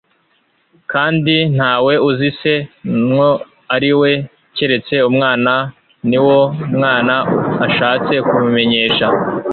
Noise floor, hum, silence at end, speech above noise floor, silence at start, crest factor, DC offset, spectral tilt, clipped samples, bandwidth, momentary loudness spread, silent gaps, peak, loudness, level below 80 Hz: -59 dBFS; none; 0 s; 46 dB; 0.9 s; 12 dB; under 0.1%; -9.5 dB/octave; under 0.1%; 4.6 kHz; 7 LU; none; -2 dBFS; -14 LUFS; -54 dBFS